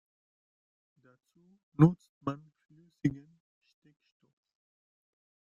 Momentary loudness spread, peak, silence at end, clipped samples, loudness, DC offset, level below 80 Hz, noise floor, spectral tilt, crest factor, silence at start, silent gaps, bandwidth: 22 LU; -10 dBFS; 2.3 s; under 0.1%; -30 LUFS; under 0.1%; -68 dBFS; under -90 dBFS; -10 dB/octave; 26 dB; 1.8 s; 2.09-2.21 s; 7 kHz